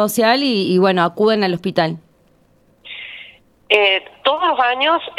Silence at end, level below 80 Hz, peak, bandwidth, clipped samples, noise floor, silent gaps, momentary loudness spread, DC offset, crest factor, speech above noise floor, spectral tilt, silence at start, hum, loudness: 0.05 s; -62 dBFS; 0 dBFS; 15.5 kHz; under 0.1%; -55 dBFS; none; 18 LU; under 0.1%; 18 dB; 39 dB; -4.5 dB/octave; 0 s; none; -16 LUFS